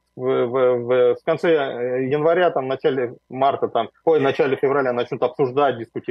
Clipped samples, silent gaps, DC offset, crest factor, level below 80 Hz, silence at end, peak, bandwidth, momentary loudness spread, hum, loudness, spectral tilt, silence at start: under 0.1%; none; under 0.1%; 14 dB; -70 dBFS; 0.1 s; -6 dBFS; 6 kHz; 6 LU; none; -20 LUFS; -7.5 dB/octave; 0.15 s